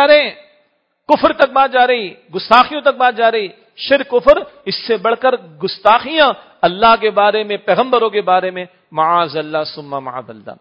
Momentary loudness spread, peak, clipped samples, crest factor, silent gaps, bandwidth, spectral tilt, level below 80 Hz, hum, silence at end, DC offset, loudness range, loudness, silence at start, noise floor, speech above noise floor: 14 LU; 0 dBFS; 0.2%; 14 dB; none; 8 kHz; -6 dB/octave; -50 dBFS; none; 0.05 s; under 0.1%; 2 LU; -14 LUFS; 0 s; -61 dBFS; 46 dB